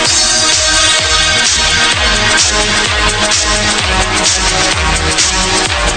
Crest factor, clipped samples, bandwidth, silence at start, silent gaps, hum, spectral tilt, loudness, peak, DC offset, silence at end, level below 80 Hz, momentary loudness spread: 12 dB; under 0.1%; 11 kHz; 0 s; none; none; -1 dB/octave; -9 LUFS; 0 dBFS; 0.1%; 0 s; -22 dBFS; 3 LU